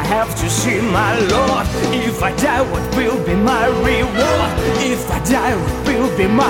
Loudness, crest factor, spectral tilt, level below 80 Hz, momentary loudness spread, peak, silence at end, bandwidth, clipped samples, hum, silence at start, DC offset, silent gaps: -16 LUFS; 12 dB; -5 dB/octave; -28 dBFS; 3 LU; -2 dBFS; 0 s; 18 kHz; under 0.1%; none; 0 s; under 0.1%; none